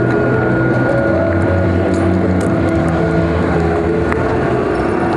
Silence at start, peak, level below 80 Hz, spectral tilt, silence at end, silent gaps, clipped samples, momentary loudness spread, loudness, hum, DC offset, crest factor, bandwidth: 0 s; 0 dBFS; -32 dBFS; -8.5 dB/octave; 0 s; none; under 0.1%; 2 LU; -14 LUFS; none; under 0.1%; 14 dB; 11 kHz